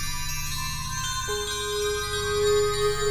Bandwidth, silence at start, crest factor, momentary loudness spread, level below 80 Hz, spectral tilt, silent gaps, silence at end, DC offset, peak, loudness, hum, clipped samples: 16 kHz; 0 s; 14 dB; 7 LU; -38 dBFS; -2.5 dB/octave; none; 0 s; under 0.1%; -12 dBFS; -26 LUFS; none; under 0.1%